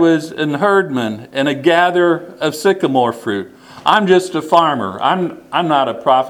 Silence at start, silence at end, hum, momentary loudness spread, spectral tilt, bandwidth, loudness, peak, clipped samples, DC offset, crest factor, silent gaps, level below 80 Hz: 0 s; 0 s; none; 9 LU; -5.5 dB/octave; 15.5 kHz; -15 LUFS; 0 dBFS; under 0.1%; under 0.1%; 14 dB; none; -62 dBFS